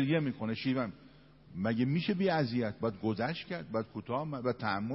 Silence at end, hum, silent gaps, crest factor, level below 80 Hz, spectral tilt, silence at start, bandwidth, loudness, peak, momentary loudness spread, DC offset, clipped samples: 0 s; none; none; 16 dB; -66 dBFS; -10.5 dB/octave; 0 s; 5.8 kHz; -34 LUFS; -18 dBFS; 7 LU; under 0.1%; under 0.1%